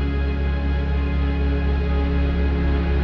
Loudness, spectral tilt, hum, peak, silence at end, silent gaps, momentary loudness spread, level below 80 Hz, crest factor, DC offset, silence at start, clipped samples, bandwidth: -22 LUFS; -9 dB/octave; none; -10 dBFS; 0 s; none; 2 LU; -20 dBFS; 10 dB; under 0.1%; 0 s; under 0.1%; 5.2 kHz